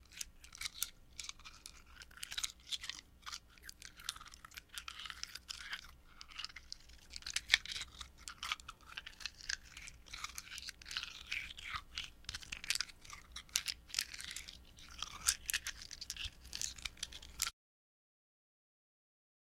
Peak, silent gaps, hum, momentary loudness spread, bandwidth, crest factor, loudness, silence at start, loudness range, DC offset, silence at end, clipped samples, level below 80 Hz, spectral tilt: -6 dBFS; none; none; 15 LU; 16.5 kHz; 40 dB; -43 LUFS; 0 s; 7 LU; under 0.1%; 2 s; under 0.1%; -60 dBFS; 1 dB/octave